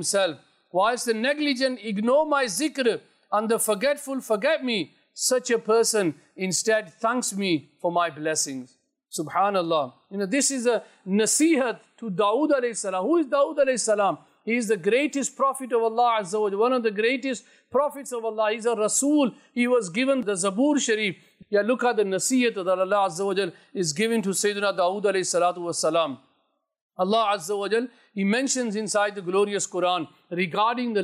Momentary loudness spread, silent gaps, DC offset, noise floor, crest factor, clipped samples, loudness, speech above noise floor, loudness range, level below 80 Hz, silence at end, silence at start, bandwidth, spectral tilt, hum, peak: 7 LU; 26.82-26.90 s; under 0.1%; -72 dBFS; 12 dB; under 0.1%; -24 LUFS; 48 dB; 2 LU; -78 dBFS; 0 s; 0 s; 16 kHz; -3 dB/octave; none; -12 dBFS